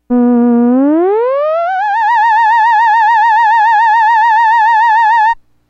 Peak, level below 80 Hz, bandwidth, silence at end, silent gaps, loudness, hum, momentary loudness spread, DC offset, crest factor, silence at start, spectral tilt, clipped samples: -2 dBFS; -54 dBFS; 7.6 kHz; 0.35 s; none; -9 LUFS; none; 4 LU; under 0.1%; 6 dB; 0.1 s; -5 dB/octave; under 0.1%